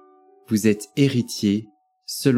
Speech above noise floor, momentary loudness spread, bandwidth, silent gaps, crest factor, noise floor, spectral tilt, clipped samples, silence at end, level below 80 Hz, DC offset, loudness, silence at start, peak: 32 dB; 8 LU; 16.5 kHz; none; 18 dB; -52 dBFS; -5.5 dB/octave; under 0.1%; 0 s; -66 dBFS; under 0.1%; -22 LUFS; 0.5 s; -4 dBFS